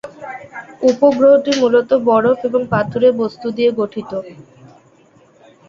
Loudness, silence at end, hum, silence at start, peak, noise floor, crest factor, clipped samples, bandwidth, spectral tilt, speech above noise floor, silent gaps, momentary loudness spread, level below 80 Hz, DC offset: -15 LUFS; 1.35 s; none; 0.05 s; -2 dBFS; -50 dBFS; 14 dB; under 0.1%; 7.6 kHz; -6 dB/octave; 36 dB; none; 18 LU; -54 dBFS; under 0.1%